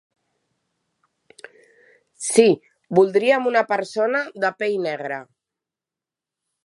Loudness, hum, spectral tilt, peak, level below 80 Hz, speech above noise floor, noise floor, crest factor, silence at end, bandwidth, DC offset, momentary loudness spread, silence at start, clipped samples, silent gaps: -20 LUFS; none; -4 dB/octave; -2 dBFS; -76 dBFS; 69 dB; -89 dBFS; 22 dB; 1.45 s; 11.5 kHz; under 0.1%; 12 LU; 2.2 s; under 0.1%; none